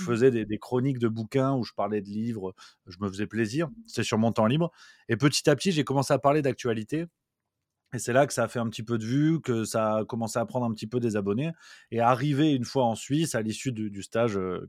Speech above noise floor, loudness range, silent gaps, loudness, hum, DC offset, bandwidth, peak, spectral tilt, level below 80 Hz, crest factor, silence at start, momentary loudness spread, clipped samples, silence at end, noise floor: 58 dB; 4 LU; none; -27 LUFS; none; under 0.1%; 15.5 kHz; -6 dBFS; -5.5 dB/octave; -66 dBFS; 20 dB; 0 s; 9 LU; under 0.1%; 0 s; -84 dBFS